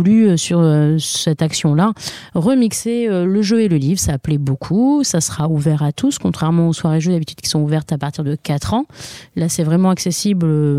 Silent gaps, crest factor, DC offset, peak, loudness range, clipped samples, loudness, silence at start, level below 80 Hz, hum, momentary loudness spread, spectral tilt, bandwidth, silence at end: none; 12 dB; under 0.1%; -4 dBFS; 3 LU; under 0.1%; -16 LUFS; 0 s; -44 dBFS; none; 7 LU; -5.5 dB/octave; 15.5 kHz; 0 s